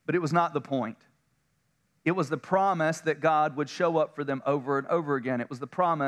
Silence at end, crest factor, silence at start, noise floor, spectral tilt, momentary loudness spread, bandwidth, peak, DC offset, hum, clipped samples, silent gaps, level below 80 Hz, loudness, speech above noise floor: 0 s; 18 dB; 0.1 s; -73 dBFS; -6.5 dB/octave; 7 LU; 12.5 kHz; -10 dBFS; under 0.1%; none; under 0.1%; none; -80 dBFS; -28 LUFS; 46 dB